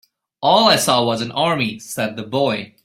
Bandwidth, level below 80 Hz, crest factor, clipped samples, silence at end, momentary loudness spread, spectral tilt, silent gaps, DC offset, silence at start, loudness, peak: 16 kHz; -58 dBFS; 18 dB; under 0.1%; 0.2 s; 11 LU; -3.5 dB/octave; none; under 0.1%; 0.4 s; -17 LUFS; 0 dBFS